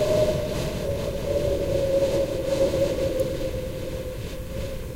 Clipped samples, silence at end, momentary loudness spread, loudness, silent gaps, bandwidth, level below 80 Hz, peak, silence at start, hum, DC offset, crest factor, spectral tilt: under 0.1%; 0 s; 10 LU; -26 LUFS; none; 16 kHz; -36 dBFS; -10 dBFS; 0 s; none; 0.3%; 14 dB; -6 dB/octave